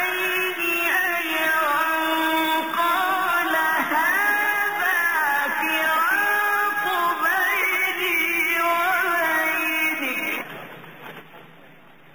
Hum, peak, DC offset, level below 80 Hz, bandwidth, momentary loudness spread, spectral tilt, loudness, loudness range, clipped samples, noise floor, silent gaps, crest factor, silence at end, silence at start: none; -10 dBFS; 0.3%; -70 dBFS; over 20 kHz; 5 LU; -1.5 dB/octave; -20 LUFS; 2 LU; under 0.1%; -50 dBFS; none; 12 dB; 0.7 s; 0 s